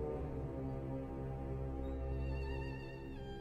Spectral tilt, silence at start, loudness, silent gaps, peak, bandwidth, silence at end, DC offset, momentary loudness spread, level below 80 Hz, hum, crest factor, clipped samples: -9 dB/octave; 0 s; -44 LUFS; none; -30 dBFS; 6.4 kHz; 0 s; under 0.1%; 6 LU; -46 dBFS; none; 12 dB; under 0.1%